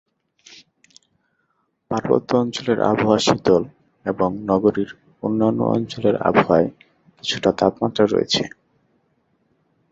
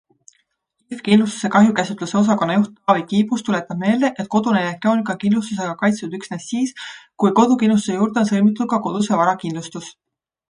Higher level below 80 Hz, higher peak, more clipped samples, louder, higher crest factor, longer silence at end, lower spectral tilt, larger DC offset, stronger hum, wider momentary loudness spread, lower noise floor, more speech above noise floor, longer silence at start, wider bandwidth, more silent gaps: first, -54 dBFS vs -64 dBFS; about the same, -2 dBFS vs 0 dBFS; neither; about the same, -20 LUFS vs -18 LUFS; about the same, 20 dB vs 18 dB; first, 1.45 s vs 0.6 s; about the same, -5.5 dB/octave vs -6 dB/octave; neither; neither; about the same, 11 LU vs 13 LU; about the same, -69 dBFS vs -69 dBFS; about the same, 51 dB vs 51 dB; first, 1.9 s vs 0.9 s; second, 8 kHz vs 10.5 kHz; neither